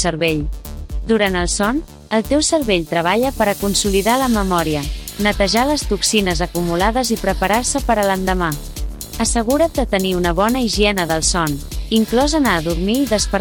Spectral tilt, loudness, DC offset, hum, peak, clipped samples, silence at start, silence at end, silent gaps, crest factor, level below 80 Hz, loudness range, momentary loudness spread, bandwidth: -4 dB/octave; -17 LUFS; under 0.1%; none; -4 dBFS; under 0.1%; 0 s; 0 s; none; 14 dB; -28 dBFS; 1 LU; 7 LU; 19.5 kHz